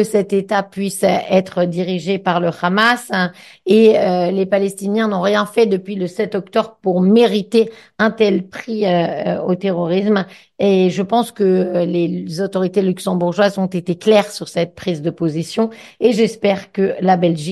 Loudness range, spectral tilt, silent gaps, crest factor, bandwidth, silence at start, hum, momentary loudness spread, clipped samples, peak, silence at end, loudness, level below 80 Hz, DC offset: 2 LU; -6 dB/octave; none; 16 dB; 12.5 kHz; 0 s; none; 7 LU; under 0.1%; 0 dBFS; 0 s; -17 LUFS; -62 dBFS; under 0.1%